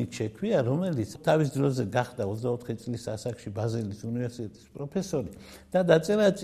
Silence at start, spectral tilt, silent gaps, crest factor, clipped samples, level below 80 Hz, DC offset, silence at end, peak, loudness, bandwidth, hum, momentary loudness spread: 0 s; -6.5 dB/octave; none; 20 dB; under 0.1%; -60 dBFS; under 0.1%; 0 s; -8 dBFS; -29 LUFS; 14.5 kHz; none; 12 LU